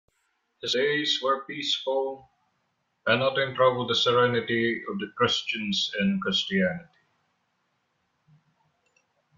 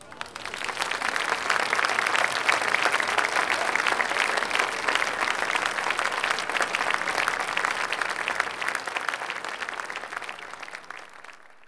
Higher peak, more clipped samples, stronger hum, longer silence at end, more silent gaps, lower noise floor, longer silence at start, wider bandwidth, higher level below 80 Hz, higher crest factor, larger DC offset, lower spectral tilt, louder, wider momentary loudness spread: about the same, -8 dBFS vs -6 dBFS; neither; neither; first, 2.55 s vs 0 s; neither; first, -75 dBFS vs -48 dBFS; first, 0.65 s vs 0 s; second, 7.6 kHz vs 11 kHz; about the same, -68 dBFS vs -68 dBFS; about the same, 20 dB vs 22 dB; neither; first, -4.5 dB/octave vs -0.5 dB/octave; about the same, -25 LUFS vs -25 LUFS; second, 9 LU vs 13 LU